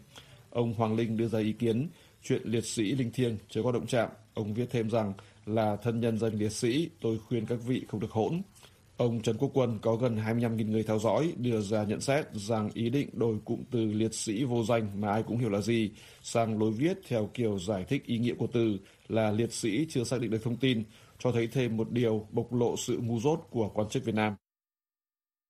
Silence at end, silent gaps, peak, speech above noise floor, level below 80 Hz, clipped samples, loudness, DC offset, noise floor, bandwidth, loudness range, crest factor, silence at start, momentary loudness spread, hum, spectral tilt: 1.15 s; none; -12 dBFS; over 60 dB; -64 dBFS; under 0.1%; -31 LUFS; under 0.1%; under -90 dBFS; 15 kHz; 2 LU; 18 dB; 0 s; 5 LU; none; -6 dB/octave